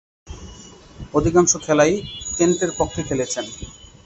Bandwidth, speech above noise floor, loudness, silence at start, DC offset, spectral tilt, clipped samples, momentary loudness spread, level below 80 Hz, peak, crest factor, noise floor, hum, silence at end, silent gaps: 8.2 kHz; 23 dB; -19 LUFS; 0.25 s; under 0.1%; -4 dB/octave; under 0.1%; 22 LU; -42 dBFS; -2 dBFS; 20 dB; -42 dBFS; none; 0.2 s; none